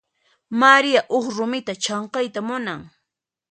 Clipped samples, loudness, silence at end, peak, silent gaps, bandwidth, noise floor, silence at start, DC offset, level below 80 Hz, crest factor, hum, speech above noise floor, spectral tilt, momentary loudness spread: under 0.1%; -20 LUFS; 0.65 s; 0 dBFS; none; 9.2 kHz; -81 dBFS; 0.5 s; under 0.1%; -68 dBFS; 22 dB; none; 61 dB; -3 dB/octave; 14 LU